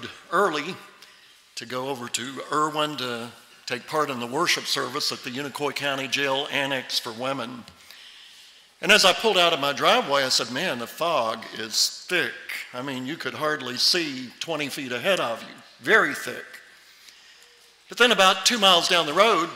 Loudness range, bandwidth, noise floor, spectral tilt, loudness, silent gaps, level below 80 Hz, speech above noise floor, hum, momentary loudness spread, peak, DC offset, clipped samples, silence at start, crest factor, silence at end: 7 LU; 16 kHz; -54 dBFS; -2 dB/octave; -23 LUFS; none; -68 dBFS; 30 dB; none; 16 LU; -6 dBFS; under 0.1%; under 0.1%; 0 s; 20 dB; 0 s